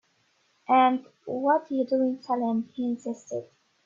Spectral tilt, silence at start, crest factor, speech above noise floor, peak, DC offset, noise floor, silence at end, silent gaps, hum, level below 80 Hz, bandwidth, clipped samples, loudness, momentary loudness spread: -6 dB/octave; 0.7 s; 18 dB; 43 dB; -10 dBFS; under 0.1%; -68 dBFS; 0.4 s; none; none; -76 dBFS; 7.6 kHz; under 0.1%; -27 LUFS; 14 LU